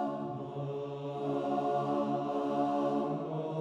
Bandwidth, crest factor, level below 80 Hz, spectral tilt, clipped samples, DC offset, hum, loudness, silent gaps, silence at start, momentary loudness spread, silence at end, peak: 9 kHz; 14 dB; -76 dBFS; -8.5 dB/octave; under 0.1%; under 0.1%; none; -34 LUFS; none; 0 s; 7 LU; 0 s; -20 dBFS